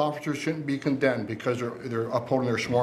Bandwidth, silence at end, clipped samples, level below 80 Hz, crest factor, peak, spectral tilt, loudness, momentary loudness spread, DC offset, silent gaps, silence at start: 14.5 kHz; 0 s; under 0.1%; -66 dBFS; 18 dB; -8 dBFS; -6 dB/octave; -28 LUFS; 5 LU; under 0.1%; none; 0 s